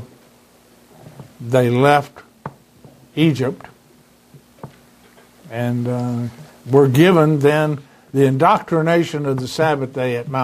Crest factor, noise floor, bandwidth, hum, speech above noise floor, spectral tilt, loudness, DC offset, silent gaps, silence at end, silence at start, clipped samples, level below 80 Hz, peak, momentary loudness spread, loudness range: 18 dB; -51 dBFS; 15.5 kHz; none; 35 dB; -7 dB/octave; -17 LUFS; under 0.1%; none; 0 s; 0 s; under 0.1%; -58 dBFS; 0 dBFS; 22 LU; 10 LU